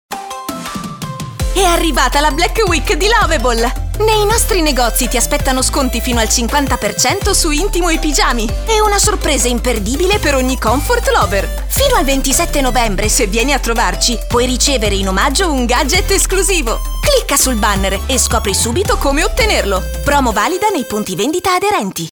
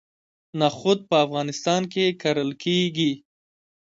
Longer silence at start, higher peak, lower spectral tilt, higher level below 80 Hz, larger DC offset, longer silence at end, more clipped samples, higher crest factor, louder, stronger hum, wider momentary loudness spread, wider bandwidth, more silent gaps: second, 0.1 s vs 0.55 s; first, 0 dBFS vs -6 dBFS; second, -3 dB/octave vs -5 dB/octave; first, -20 dBFS vs -66 dBFS; neither; second, 0 s vs 0.8 s; neither; second, 12 dB vs 18 dB; first, -13 LUFS vs -23 LUFS; neither; about the same, 5 LU vs 5 LU; first, over 20 kHz vs 7.8 kHz; neither